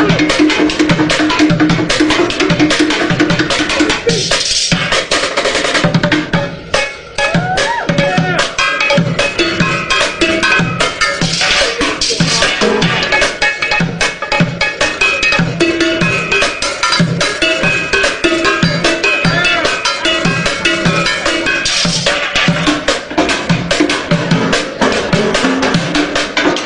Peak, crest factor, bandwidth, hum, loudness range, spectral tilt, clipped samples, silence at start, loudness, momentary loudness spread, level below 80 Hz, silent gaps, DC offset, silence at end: 0 dBFS; 12 dB; 10.5 kHz; none; 2 LU; -3.5 dB/octave; under 0.1%; 0 s; -12 LUFS; 3 LU; -34 dBFS; none; under 0.1%; 0 s